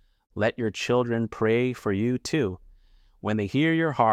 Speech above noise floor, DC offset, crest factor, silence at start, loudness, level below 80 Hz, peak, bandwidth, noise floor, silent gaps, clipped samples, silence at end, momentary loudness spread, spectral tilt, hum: 32 dB; under 0.1%; 18 dB; 0.35 s; -26 LUFS; -58 dBFS; -8 dBFS; 14 kHz; -57 dBFS; none; under 0.1%; 0 s; 7 LU; -6 dB/octave; none